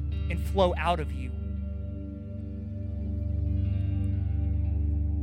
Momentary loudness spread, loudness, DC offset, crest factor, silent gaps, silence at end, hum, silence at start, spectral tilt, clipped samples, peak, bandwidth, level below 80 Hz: 11 LU; -30 LUFS; under 0.1%; 18 dB; none; 0 s; 50 Hz at -55 dBFS; 0 s; -8 dB/octave; under 0.1%; -10 dBFS; 9.4 kHz; -32 dBFS